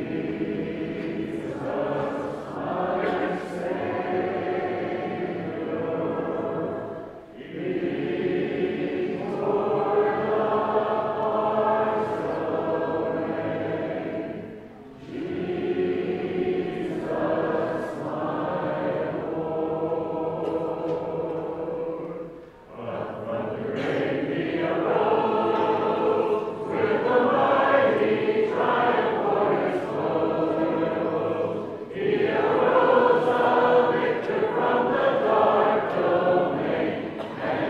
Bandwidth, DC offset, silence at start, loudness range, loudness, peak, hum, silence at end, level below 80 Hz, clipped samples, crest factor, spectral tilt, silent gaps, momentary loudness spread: 9 kHz; under 0.1%; 0 s; 8 LU; -25 LUFS; -6 dBFS; none; 0 s; -60 dBFS; under 0.1%; 18 dB; -7.5 dB/octave; none; 11 LU